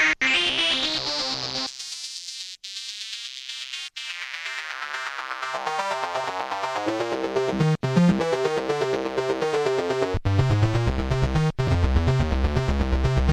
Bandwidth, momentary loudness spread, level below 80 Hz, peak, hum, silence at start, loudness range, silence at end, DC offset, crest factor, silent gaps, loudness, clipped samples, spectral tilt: 13 kHz; 11 LU; -32 dBFS; -8 dBFS; 50 Hz at -55 dBFS; 0 s; 8 LU; 0 s; under 0.1%; 16 dB; none; -25 LUFS; under 0.1%; -5 dB/octave